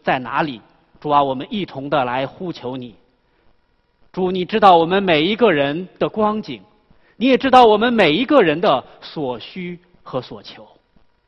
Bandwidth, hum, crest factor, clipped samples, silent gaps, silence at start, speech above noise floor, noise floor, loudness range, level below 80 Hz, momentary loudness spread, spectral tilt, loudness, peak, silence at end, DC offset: 9.2 kHz; none; 18 dB; under 0.1%; none; 0.05 s; 44 dB; -61 dBFS; 7 LU; -54 dBFS; 20 LU; -6.5 dB/octave; -17 LUFS; 0 dBFS; 0.65 s; under 0.1%